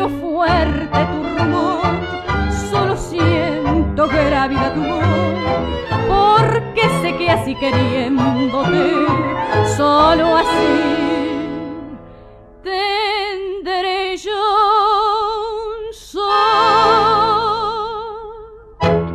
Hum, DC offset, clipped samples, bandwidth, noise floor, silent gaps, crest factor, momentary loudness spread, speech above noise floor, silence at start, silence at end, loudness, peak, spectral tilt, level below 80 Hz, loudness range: none; under 0.1%; under 0.1%; 14 kHz; -40 dBFS; none; 14 dB; 12 LU; 25 dB; 0 s; 0 s; -16 LUFS; -2 dBFS; -6 dB/octave; -34 dBFS; 3 LU